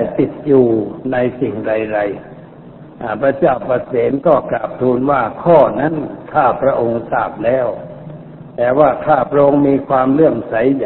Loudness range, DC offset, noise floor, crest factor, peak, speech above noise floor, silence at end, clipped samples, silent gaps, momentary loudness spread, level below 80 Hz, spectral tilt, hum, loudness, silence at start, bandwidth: 3 LU; under 0.1%; -36 dBFS; 14 dB; 0 dBFS; 22 dB; 0 s; under 0.1%; none; 11 LU; -46 dBFS; -11.5 dB/octave; none; -15 LUFS; 0 s; 4.2 kHz